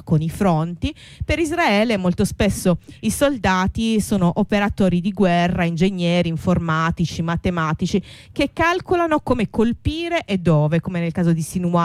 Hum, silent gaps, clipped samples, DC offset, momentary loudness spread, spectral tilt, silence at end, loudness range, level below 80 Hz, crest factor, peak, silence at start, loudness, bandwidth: none; none; under 0.1%; under 0.1%; 6 LU; -6 dB/octave; 0 s; 2 LU; -38 dBFS; 14 dB; -6 dBFS; 0.05 s; -20 LUFS; 15 kHz